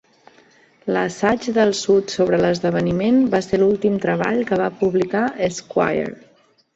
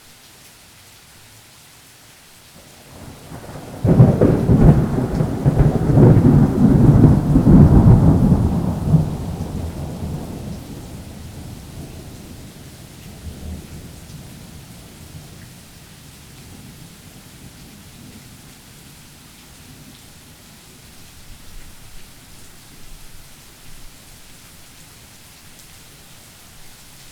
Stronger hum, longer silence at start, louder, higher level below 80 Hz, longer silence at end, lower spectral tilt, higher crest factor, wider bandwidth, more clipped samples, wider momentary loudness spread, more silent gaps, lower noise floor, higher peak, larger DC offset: neither; second, 0.85 s vs 3 s; second, -19 LUFS vs -14 LUFS; second, -52 dBFS vs -30 dBFS; second, 0.6 s vs 3.25 s; second, -5.5 dB/octave vs -8.5 dB/octave; about the same, 16 dB vs 18 dB; second, 8.2 kHz vs 16.5 kHz; neither; second, 5 LU vs 28 LU; neither; first, -53 dBFS vs -46 dBFS; about the same, -2 dBFS vs 0 dBFS; neither